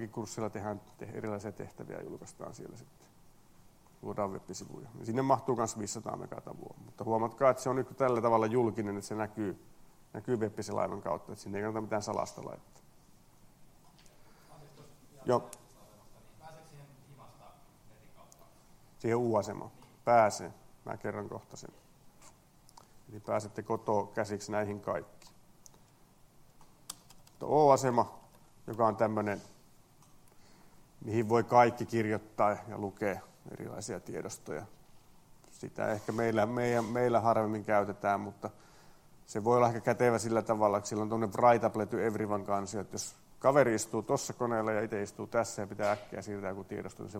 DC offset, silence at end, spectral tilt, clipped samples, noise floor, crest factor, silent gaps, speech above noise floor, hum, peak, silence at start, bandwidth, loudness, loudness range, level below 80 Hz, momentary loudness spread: under 0.1%; 0 s; -6 dB/octave; under 0.1%; -62 dBFS; 24 dB; none; 29 dB; none; -10 dBFS; 0 s; 16.5 kHz; -32 LUFS; 11 LU; -66 dBFS; 19 LU